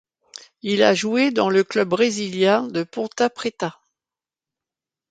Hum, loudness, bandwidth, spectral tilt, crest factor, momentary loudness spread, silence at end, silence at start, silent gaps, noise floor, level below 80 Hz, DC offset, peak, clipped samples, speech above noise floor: none; -20 LUFS; 9.4 kHz; -4.5 dB/octave; 20 dB; 10 LU; 1.4 s; 0.65 s; none; under -90 dBFS; -68 dBFS; under 0.1%; -2 dBFS; under 0.1%; over 70 dB